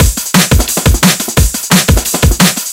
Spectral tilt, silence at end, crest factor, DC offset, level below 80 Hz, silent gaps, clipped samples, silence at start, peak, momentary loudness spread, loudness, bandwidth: -3.5 dB/octave; 0 s; 10 dB; under 0.1%; -16 dBFS; none; 0.9%; 0 s; 0 dBFS; 3 LU; -9 LUFS; over 20 kHz